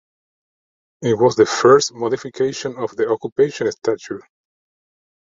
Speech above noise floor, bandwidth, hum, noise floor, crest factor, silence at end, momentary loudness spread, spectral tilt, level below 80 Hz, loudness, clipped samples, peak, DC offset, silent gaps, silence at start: over 72 dB; 7.8 kHz; none; under -90 dBFS; 18 dB; 1.05 s; 13 LU; -4.5 dB/octave; -60 dBFS; -18 LUFS; under 0.1%; -2 dBFS; under 0.1%; 3.32-3.36 s; 1 s